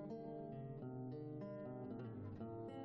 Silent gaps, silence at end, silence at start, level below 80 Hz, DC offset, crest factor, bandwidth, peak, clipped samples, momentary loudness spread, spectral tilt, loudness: none; 0 s; 0 s; -74 dBFS; under 0.1%; 8 dB; 5.8 kHz; -40 dBFS; under 0.1%; 1 LU; -9.5 dB/octave; -50 LUFS